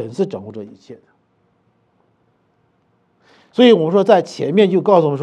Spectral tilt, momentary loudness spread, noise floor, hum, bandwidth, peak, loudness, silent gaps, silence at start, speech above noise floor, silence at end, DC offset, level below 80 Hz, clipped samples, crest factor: -7 dB/octave; 21 LU; -61 dBFS; none; 9.4 kHz; 0 dBFS; -14 LUFS; none; 0 s; 47 dB; 0 s; under 0.1%; -74 dBFS; under 0.1%; 18 dB